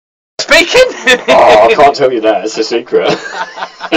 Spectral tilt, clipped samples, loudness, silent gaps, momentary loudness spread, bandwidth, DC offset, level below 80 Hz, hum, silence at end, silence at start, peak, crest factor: -2.5 dB/octave; 0.7%; -8 LUFS; none; 15 LU; 16.5 kHz; under 0.1%; -42 dBFS; none; 0 s; 0.4 s; 0 dBFS; 10 dB